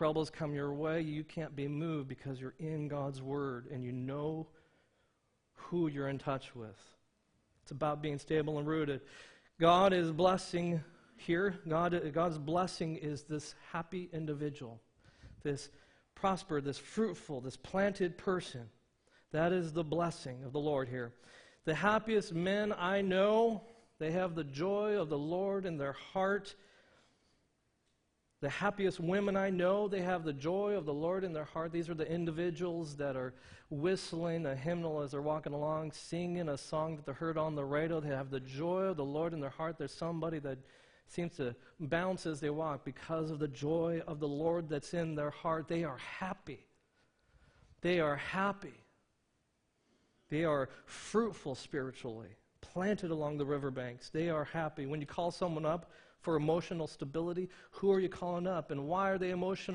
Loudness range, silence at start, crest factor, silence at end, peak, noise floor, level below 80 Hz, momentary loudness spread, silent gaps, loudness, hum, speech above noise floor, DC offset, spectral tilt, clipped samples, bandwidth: 7 LU; 0 s; 24 dB; 0 s; -14 dBFS; -79 dBFS; -66 dBFS; 11 LU; none; -37 LUFS; none; 43 dB; under 0.1%; -6.5 dB/octave; under 0.1%; 10 kHz